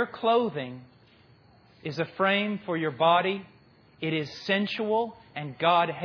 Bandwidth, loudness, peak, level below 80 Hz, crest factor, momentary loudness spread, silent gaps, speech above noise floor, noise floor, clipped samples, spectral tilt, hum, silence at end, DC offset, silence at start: 5.4 kHz; -27 LUFS; -10 dBFS; -72 dBFS; 18 dB; 14 LU; none; 31 dB; -58 dBFS; under 0.1%; -6.5 dB/octave; none; 0 s; under 0.1%; 0 s